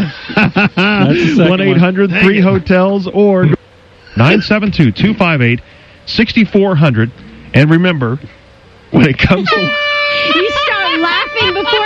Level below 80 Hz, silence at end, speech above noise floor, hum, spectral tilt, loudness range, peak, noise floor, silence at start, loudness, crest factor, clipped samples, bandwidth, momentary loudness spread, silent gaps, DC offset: -36 dBFS; 0 s; 30 dB; none; -7 dB/octave; 2 LU; 0 dBFS; -41 dBFS; 0 s; -11 LUFS; 12 dB; under 0.1%; 7.6 kHz; 6 LU; none; under 0.1%